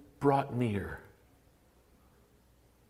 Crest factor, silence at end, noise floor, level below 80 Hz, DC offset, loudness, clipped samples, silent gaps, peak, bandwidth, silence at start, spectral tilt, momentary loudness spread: 24 dB; 1.85 s; -65 dBFS; -62 dBFS; under 0.1%; -32 LUFS; under 0.1%; none; -12 dBFS; 15.5 kHz; 0.2 s; -8 dB/octave; 15 LU